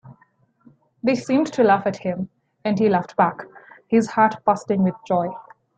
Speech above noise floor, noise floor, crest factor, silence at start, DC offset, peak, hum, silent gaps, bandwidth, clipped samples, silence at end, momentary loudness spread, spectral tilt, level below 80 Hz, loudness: 41 dB; -61 dBFS; 18 dB; 0.05 s; under 0.1%; -2 dBFS; none; none; 9 kHz; under 0.1%; 0.35 s; 13 LU; -7 dB/octave; -64 dBFS; -21 LUFS